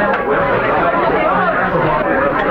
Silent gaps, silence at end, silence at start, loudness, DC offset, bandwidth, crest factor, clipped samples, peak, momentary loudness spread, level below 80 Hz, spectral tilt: none; 0 s; 0 s; -14 LUFS; under 0.1%; 15.5 kHz; 12 dB; under 0.1%; -2 dBFS; 1 LU; -36 dBFS; -8.5 dB/octave